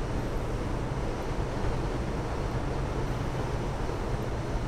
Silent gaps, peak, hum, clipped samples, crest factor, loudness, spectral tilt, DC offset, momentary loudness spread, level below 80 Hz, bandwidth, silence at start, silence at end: none; -18 dBFS; none; under 0.1%; 14 dB; -33 LUFS; -6.5 dB/octave; under 0.1%; 1 LU; -34 dBFS; 14 kHz; 0 s; 0 s